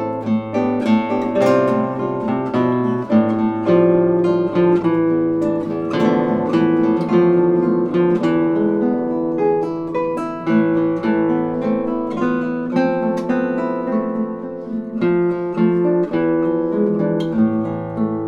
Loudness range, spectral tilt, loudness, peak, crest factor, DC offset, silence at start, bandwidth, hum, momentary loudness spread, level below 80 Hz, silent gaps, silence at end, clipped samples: 3 LU; -9 dB/octave; -18 LUFS; -2 dBFS; 14 dB; under 0.1%; 0 s; 7.2 kHz; none; 6 LU; -54 dBFS; none; 0 s; under 0.1%